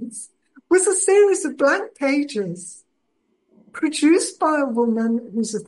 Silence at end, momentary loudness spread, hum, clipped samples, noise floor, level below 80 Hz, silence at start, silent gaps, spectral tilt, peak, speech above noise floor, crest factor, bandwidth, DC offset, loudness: 0.05 s; 18 LU; none; under 0.1%; -70 dBFS; -72 dBFS; 0 s; none; -3.5 dB/octave; -6 dBFS; 51 dB; 16 dB; 11.5 kHz; under 0.1%; -19 LUFS